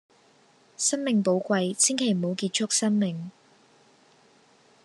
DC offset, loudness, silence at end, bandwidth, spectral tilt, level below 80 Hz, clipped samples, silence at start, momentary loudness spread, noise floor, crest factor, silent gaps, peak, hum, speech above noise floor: under 0.1%; -25 LUFS; 1.55 s; 12.5 kHz; -3.5 dB/octave; -82 dBFS; under 0.1%; 0.8 s; 6 LU; -60 dBFS; 20 dB; none; -8 dBFS; none; 35 dB